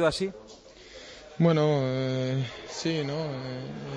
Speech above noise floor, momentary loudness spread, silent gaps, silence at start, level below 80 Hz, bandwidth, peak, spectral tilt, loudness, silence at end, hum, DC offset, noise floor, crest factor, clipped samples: 20 dB; 22 LU; none; 0 s; -58 dBFS; 10.5 kHz; -10 dBFS; -6.5 dB/octave; -28 LUFS; 0 s; none; under 0.1%; -48 dBFS; 18 dB; under 0.1%